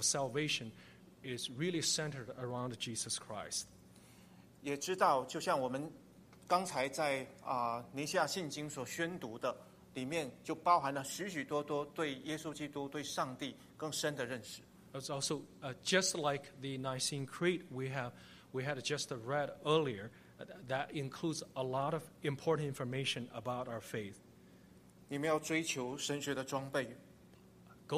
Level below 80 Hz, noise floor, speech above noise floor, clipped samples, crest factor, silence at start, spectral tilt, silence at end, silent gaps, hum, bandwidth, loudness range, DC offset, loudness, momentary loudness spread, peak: -74 dBFS; -61 dBFS; 23 dB; under 0.1%; 22 dB; 0 s; -3.5 dB/octave; 0 s; none; none; 15 kHz; 3 LU; under 0.1%; -38 LUFS; 13 LU; -16 dBFS